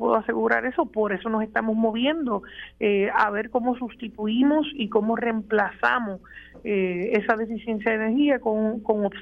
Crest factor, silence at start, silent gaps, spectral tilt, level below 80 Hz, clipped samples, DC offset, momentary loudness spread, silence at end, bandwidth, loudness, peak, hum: 18 dB; 0 s; none; -7.5 dB/octave; -56 dBFS; under 0.1%; under 0.1%; 7 LU; 0 s; 5.8 kHz; -24 LUFS; -6 dBFS; none